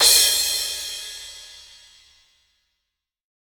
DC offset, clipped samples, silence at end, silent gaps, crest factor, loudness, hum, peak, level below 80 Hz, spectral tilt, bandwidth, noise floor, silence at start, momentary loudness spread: under 0.1%; under 0.1%; 1.8 s; none; 22 dB; -18 LUFS; none; -2 dBFS; -56 dBFS; 3 dB/octave; over 20 kHz; -82 dBFS; 0 s; 25 LU